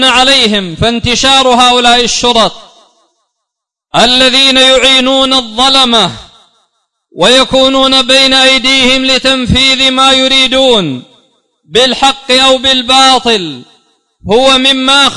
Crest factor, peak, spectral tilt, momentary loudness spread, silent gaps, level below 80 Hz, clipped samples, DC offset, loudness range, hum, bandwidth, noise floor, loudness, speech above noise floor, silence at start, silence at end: 8 dB; 0 dBFS; -2.5 dB/octave; 7 LU; none; -34 dBFS; 0.9%; under 0.1%; 3 LU; none; 12 kHz; -75 dBFS; -6 LUFS; 68 dB; 0 s; 0 s